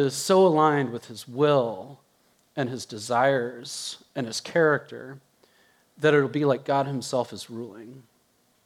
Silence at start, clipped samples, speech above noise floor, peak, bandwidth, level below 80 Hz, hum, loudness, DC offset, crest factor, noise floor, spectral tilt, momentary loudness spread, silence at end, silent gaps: 0 s; under 0.1%; 41 dB; -6 dBFS; 15.5 kHz; -78 dBFS; none; -24 LUFS; under 0.1%; 20 dB; -66 dBFS; -5 dB/octave; 18 LU; 0.65 s; none